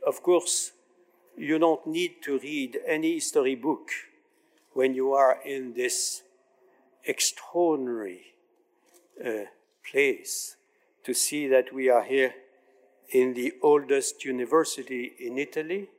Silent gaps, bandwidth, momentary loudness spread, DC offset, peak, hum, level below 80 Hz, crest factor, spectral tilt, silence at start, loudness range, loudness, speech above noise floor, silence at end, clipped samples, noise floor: none; 16 kHz; 13 LU; under 0.1%; -10 dBFS; none; under -90 dBFS; 18 dB; -2.5 dB/octave; 0 s; 5 LU; -27 LUFS; 41 dB; 0.1 s; under 0.1%; -67 dBFS